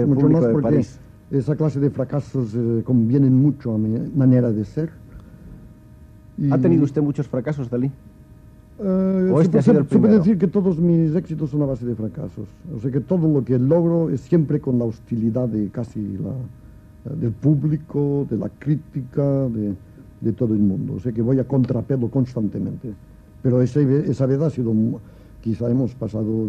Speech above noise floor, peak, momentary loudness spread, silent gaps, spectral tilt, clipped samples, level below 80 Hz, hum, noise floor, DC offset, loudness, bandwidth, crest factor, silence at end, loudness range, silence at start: 26 dB; -4 dBFS; 12 LU; none; -10.5 dB/octave; under 0.1%; -48 dBFS; none; -45 dBFS; under 0.1%; -20 LUFS; 8 kHz; 16 dB; 0 s; 5 LU; 0 s